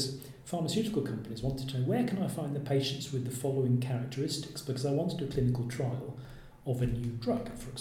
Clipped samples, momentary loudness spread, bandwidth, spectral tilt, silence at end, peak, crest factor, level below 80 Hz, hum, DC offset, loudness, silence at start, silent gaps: under 0.1%; 8 LU; 15.5 kHz; -6 dB/octave; 0 s; -18 dBFS; 14 dB; -52 dBFS; none; under 0.1%; -33 LUFS; 0 s; none